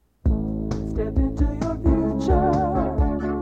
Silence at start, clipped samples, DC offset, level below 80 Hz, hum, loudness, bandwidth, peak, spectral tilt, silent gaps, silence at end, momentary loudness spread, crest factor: 0.25 s; under 0.1%; under 0.1%; -26 dBFS; none; -23 LUFS; 7.6 kHz; -6 dBFS; -9 dB/octave; none; 0 s; 6 LU; 14 dB